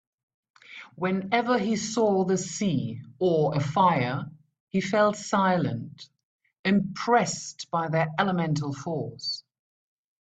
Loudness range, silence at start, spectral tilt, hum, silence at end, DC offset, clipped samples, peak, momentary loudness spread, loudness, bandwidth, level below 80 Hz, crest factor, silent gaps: 2 LU; 0.7 s; -5.5 dB/octave; none; 0.8 s; under 0.1%; under 0.1%; -8 dBFS; 11 LU; -26 LUFS; 9 kHz; -64 dBFS; 20 dB; 4.60-4.67 s, 6.23-6.39 s, 6.59-6.64 s